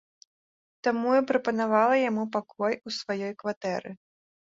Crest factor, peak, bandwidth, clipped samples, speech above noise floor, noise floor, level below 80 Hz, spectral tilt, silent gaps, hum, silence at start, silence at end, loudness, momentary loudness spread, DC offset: 18 dB; -10 dBFS; 7.8 kHz; under 0.1%; over 63 dB; under -90 dBFS; -74 dBFS; -5.5 dB/octave; 3.57-3.61 s; none; 0.85 s; 0.65 s; -27 LUFS; 10 LU; under 0.1%